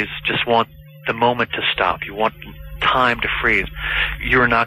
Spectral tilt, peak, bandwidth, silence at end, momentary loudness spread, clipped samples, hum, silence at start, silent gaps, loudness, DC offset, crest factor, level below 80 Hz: -5.5 dB/octave; -4 dBFS; 15 kHz; 0 s; 9 LU; under 0.1%; none; 0 s; none; -18 LUFS; under 0.1%; 14 dB; -36 dBFS